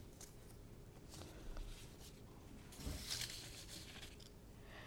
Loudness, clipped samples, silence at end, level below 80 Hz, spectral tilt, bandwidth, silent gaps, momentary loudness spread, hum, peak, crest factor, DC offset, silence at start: -52 LUFS; under 0.1%; 0 s; -58 dBFS; -3 dB/octave; over 20 kHz; none; 15 LU; none; -28 dBFS; 26 dB; under 0.1%; 0 s